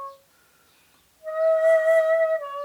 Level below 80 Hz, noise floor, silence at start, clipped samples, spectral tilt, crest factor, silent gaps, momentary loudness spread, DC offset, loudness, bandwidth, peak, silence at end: -78 dBFS; -60 dBFS; 0 s; under 0.1%; -1 dB/octave; 12 dB; none; 19 LU; under 0.1%; -21 LUFS; 12 kHz; -10 dBFS; 0 s